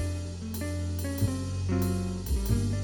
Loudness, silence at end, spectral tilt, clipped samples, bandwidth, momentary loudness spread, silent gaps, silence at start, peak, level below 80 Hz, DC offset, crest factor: -31 LUFS; 0 s; -6.5 dB/octave; under 0.1%; over 20 kHz; 6 LU; none; 0 s; -14 dBFS; -36 dBFS; under 0.1%; 16 dB